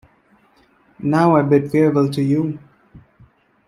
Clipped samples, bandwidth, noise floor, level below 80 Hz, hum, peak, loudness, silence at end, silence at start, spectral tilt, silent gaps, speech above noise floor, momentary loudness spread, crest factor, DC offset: under 0.1%; 12.5 kHz; -56 dBFS; -56 dBFS; none; -2 dBFS; -17 LUFS; 0.7 s; 1 s; -8.5 dB/octave; none; 40 dB; 12 LU; 16 dB; under 0.1%